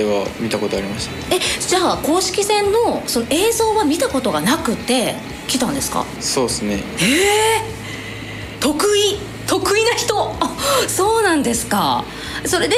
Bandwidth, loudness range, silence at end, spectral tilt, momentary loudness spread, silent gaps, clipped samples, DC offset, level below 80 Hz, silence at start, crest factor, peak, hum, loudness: 16 kHz; 2 LU; 0 s; -3 dB/octave; 9 LU; none; under 0.1%; under 0.1%; -42 dBFS; 0 s; 12 dB; -4 dBFS; none; -17 LUFS